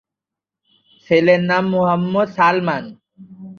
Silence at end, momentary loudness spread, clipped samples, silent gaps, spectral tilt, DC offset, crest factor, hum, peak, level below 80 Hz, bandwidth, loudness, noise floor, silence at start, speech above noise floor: 0.05 s; 9 LU; under 0.1%; none; -7.5 dB/octave; under 0.1%; 16 dB; none; -2 dBFS; -62 dBFS; 6.8 kHz; -16 LUFS; -86 dBFS; 1.1 s; 70 dB